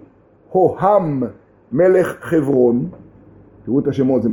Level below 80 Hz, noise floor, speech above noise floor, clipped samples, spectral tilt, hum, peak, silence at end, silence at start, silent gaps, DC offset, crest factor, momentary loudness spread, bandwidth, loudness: -52 dBFS; -48 dBFS; 33 dB; under 0.1%; -9 dB/octave; none; -2 dBFS; 0 s; 0.5 s; none; under 0.1%; 16 dB; 11 LU; 17 kHz; -17 LUFS